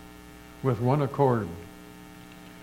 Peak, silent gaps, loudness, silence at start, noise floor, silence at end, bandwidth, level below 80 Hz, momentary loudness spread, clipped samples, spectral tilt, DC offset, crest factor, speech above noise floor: -8 dBFS; none; -27 LUFS; 0 s; -47 dBFS; 0 s; 16.5 kHz; -56 dBFS; 23 LU; under 0.1%; -8.5 dB/octave; under 0.1%; 20 dB; 22 dB